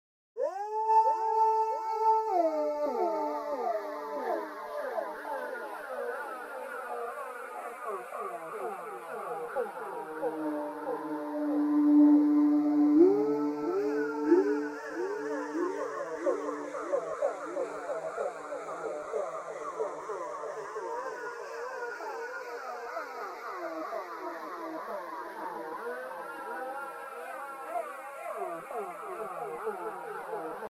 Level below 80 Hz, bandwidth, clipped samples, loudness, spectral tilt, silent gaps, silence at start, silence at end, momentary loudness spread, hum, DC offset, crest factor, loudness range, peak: -82 dBFS; 13.5 kHz; under 0.1%; -32 LUFS; -5.5 dB/octave; none; 0.35 s; 0 s; 14 LU; none; under 0.1%; 20 dB; 13 LU; -12 dBFS